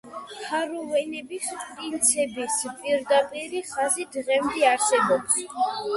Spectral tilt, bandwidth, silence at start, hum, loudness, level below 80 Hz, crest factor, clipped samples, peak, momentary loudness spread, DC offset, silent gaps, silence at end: -1.5 dB/octave; 12 kHz; 0.05 s; none; -24 LUFS; -66 dBFS; 20 dB; under 0.1%; -6 dBFS; 11 LU; under 0.1%; none; 0 s